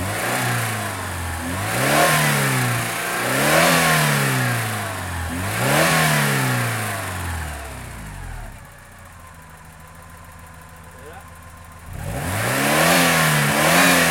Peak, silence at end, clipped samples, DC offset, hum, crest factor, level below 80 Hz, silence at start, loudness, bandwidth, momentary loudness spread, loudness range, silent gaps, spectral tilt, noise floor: -2 dBFS; 0 s; under 0.1%; under 0.1%; none; 18 dB; -44 dBFS; 0 s; -18 LUFS; 17 kHz; 20 LU; 21 LU; none; -3.5 dB/octave; -42 dBFS